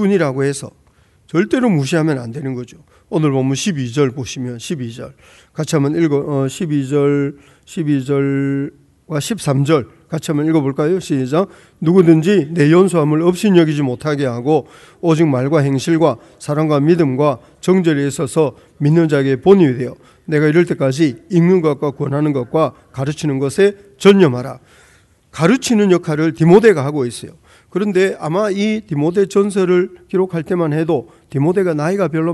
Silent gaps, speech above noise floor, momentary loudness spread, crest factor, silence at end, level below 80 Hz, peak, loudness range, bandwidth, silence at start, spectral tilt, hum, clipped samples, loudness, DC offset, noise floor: none; 36 dB; 13 LU; 16 dB; 0 s; -54 dBFS; 0 dBFS; 5 LU; 12 kHz; 0 s; -7 dB/octave; none; under 0.1%; -16 LUFS; under 0.1%; -51 dBFS